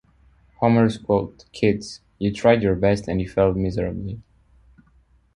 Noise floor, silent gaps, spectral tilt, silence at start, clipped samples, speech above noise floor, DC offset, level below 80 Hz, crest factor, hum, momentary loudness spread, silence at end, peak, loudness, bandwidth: -58 dBFS; none; -7.5 dB/octave; 0.6 s; under 0.1%; 37 dB; under 0.1%; -42 dBFS; 18 dB; none; 15 LU; 1.15 s; -4 dBFS; -21 LUFS; 11 kHz